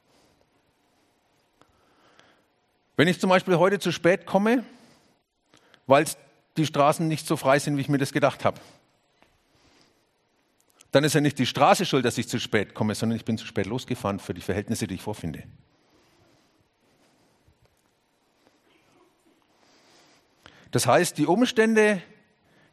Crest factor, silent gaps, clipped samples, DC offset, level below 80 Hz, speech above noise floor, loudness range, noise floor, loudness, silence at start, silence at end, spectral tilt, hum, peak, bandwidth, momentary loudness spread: 24 dB; none; under 0.1%; under 0.1%; -66 dBFS; 45 dB; 9 LU; -69 dBFS; -24 LUFS; 3 s; 0.7 s; -5 dB/octave; none; -2 dBFS; 13 kHz; 12 LU